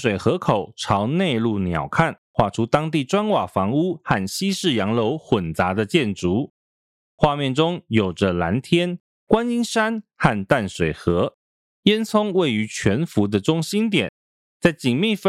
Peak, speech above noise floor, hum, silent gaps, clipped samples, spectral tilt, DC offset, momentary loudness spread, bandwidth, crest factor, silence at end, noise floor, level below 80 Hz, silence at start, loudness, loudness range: -4 dBFS; over 70 dB; none; 2.18-2.34 s, 6.50-7.18 s, 9.00-9.27 s, 11.34-11.83 s, 14.09-14.60 s; under 0.1%; -5.5 dB/octave; under 0.1%; 3 LU; 14.5 kHz; 18 dB; 0 s; under -90 dBFS; -48 dBFS; 0 s; -21 LUFS; 1 LU